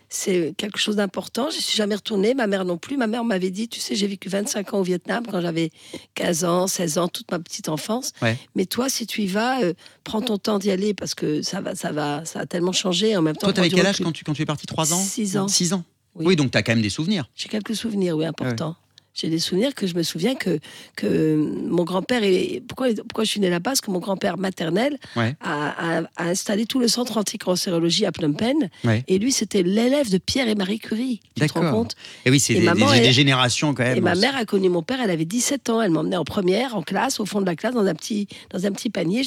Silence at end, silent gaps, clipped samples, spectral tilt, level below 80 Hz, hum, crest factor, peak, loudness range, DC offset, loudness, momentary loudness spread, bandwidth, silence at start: 0 s; none; under 0.1%; -4.5 dB/octave; -62 dBFS; none; 18 dB; -4 dBFS; 6 LU; under 0.1%; -22 LUFS; 7 LU; 17 kHz; 0.1 s